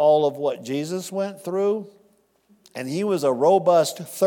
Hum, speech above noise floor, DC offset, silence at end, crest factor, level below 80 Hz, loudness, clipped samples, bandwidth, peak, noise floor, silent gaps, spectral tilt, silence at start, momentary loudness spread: none; 40 dB; under 0.1%; 0 s; 16 dB; -80 dBFS; -22 LUFS; under 0.1%; 18 kHz; -6 dBFS; -61 dBFS; none; -5.5 dB/octave; 0 s; 11 LU